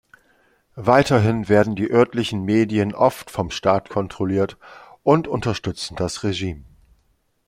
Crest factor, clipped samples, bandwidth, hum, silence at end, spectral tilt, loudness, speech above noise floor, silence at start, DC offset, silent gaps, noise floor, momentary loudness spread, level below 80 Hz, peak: 20 dB; under 0.1%; 15.5 kHz; none; 0.85 s; -6 dB/octave; -20 LUFS; 45 dB; 0.75 s; under 0.1%; none; -64 dBFS; 9 LU; -50 dBFS; -2 dBFS